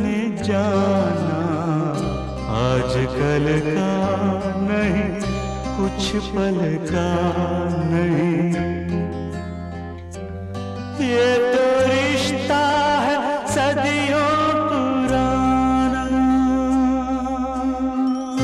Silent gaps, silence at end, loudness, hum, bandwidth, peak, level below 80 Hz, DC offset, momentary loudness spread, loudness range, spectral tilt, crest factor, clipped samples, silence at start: none; 0 s; -20 LUFS; none; 12.5 kHz; -6 dBFS; -38 dBFS; under 0.1%; 9 LU; 4 LU; -6 dB/octave; 14 dB; under 0.1%; 0 s